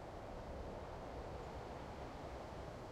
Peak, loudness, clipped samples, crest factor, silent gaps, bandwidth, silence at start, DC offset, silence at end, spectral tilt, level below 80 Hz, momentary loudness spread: -36 dBFS; -50 LUFS; under 0.1%; 14 dB; none; 15.5 kHz; 0 s; under 0.1%; 0 s; -6.5 dB/octave; -56 dBFS; 1 LU